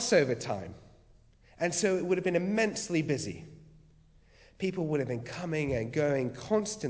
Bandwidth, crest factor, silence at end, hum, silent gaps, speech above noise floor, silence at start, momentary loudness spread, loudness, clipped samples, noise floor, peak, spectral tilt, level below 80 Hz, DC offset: 8 kHz; 20 dB; 0 s; none; none; 30 dB; 0 s; 9 LU; -31 LUFS; under 0.1%; -60 dBFS; -12 dBFS; -5 dB/octave; -58 dBFS; under 0.1%